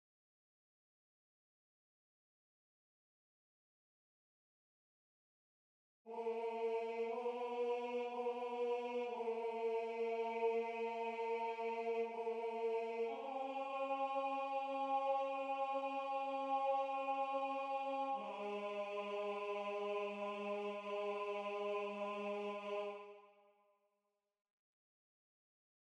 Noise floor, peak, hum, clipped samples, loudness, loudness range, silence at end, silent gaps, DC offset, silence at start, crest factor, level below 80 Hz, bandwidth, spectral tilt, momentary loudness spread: -88 dBFS; -28 dBFS; none; under 0.1%; -42 LUFS; 7 LU; 2.55 s; none; under 0.1%; 6.05 s; 16 dB; under -90 dBFS; 9.2 kHz; -5 dB/octave; 5 LU